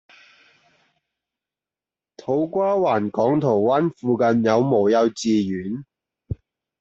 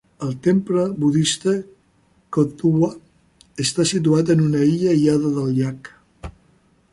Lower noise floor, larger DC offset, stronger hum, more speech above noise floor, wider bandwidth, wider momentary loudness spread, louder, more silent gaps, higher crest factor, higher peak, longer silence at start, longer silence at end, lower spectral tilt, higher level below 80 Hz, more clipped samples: first, under -90 dBFS vs -59 dBFS; neither; neither; first, over 71 dB vs 41 dB; second, 8 kHz vs 11.5 kHz; about the same, 17 LU vs 17 LU; about the same, -20 LUFS vs -19 LUFS; neither; about the same, 18 dB vs 16 dB; about the same, -6 dBFS vs -4 dBFS; first, 2.3 s vs 0.2 s; second, 0.45 s vs 0.65 s; about the same, -6.5 dB/octave vs -6 dB/octave; about the same, -54 dBFS vs -52 dBFS; neither